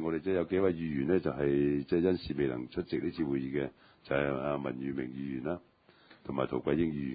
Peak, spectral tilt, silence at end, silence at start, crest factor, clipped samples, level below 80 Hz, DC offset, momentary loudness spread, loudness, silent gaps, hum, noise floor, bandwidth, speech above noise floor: -16 dBFS; -11 dB/octave; 0 s; 0 s; 18 dB; under 0.1%; -56 dBFS; under 0.1%; 8 LU; -33 LUFS; none; none; -61 dBFS; 5 kHz; 29 dB